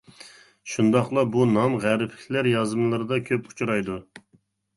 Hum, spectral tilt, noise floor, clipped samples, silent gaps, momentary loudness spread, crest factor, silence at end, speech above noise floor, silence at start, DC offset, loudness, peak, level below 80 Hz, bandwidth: none; -6.5 dB/octave; -64 dBFS; under 0.1%; none; 9 LU; 18 dB; 0.55 s; 41 dB; 0.2 s; under 0.1%; -24 LUFS; -6 dBFS; -60 dBFS; 11.5 kHz